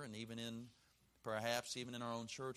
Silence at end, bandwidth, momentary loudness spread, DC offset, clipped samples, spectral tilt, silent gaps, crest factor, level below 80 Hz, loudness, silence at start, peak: 0 s; 15 kHz; 13 LU; under 0.1%; under 0.1%; -3.5 dB/octave; none; 24 dB; -80 dBFS; -45 LUFS; 0 s; -22 dBFS